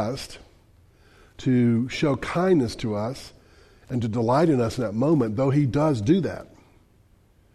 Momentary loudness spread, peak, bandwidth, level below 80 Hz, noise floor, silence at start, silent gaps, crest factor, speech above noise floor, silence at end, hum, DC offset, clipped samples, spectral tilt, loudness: 11 LU; -8 dBFS; 13 kHz; -50 dBFS; -58 dBFS; 0 s; none; 16 dB; 36 dB; 1.1 s; none; under 0.1%; under 0.1%; -7.5 dB/octave; -23 LUFS